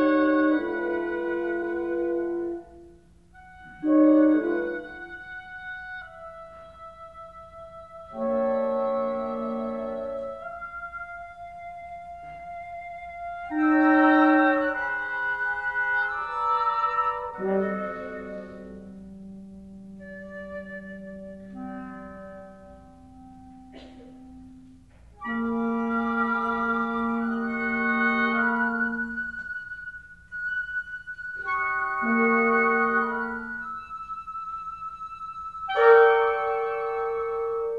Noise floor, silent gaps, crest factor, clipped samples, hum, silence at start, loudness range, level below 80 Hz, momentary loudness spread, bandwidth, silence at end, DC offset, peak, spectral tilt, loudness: -54 dBFS; none; 20 dB; under 0.1%; none; 0 s; 17 LU; -58 dBFS; 22 LU; 5.4 kHz; 0 s; under 0.1%; -6 dBFS; -7 dB/octave; -25 LUFS